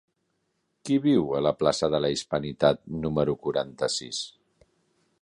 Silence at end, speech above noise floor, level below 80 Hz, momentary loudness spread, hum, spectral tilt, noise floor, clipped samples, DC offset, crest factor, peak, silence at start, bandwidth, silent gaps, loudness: 0.9 s; 50 dB; -56 dBFS; 8 LU; none; -5 dB/octave; -75 dBFS; under 0.1%; under 0.1%; 20 dB; -6 dBFS; 0.85 s; 11 kHz; none; -26 LUFS